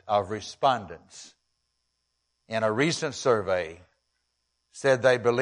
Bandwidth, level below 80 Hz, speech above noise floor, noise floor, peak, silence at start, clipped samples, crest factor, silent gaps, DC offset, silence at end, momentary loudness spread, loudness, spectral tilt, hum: 11 kHz; -66 dBFS; 52 dB; -78 dBFS; -8 dBFS; 0.05 s; under 0.1%; 20 dB; none; under 0.1%; 0 s; 20 LU; -26 LUFS; -4.5 dB/octave; none